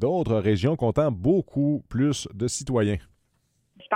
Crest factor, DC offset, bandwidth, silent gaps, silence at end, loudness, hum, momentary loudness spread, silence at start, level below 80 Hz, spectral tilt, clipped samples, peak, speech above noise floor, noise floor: 16 dB; under 0.1%; 13.5 kHz; none; 0 s; -25 LUFS; none; 6 LU; 0 s; -48 dBFS; -6.5 dB/octave; under 0.1%; -8 dBFS; 46 dB; -70 dBFS